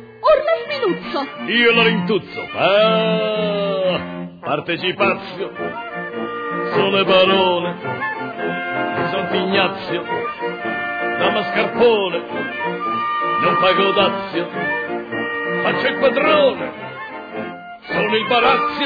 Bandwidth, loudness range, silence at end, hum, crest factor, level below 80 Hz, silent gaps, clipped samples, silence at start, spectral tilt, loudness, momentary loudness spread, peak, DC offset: 5 kHz; 4 LU; 0 s; none; 16 dB; -56 dBFS; none; under 0.1%; 0 s; -7.5 dB/octave; -18 LUFS; 12 LU; -4 dBFS; under 0.1%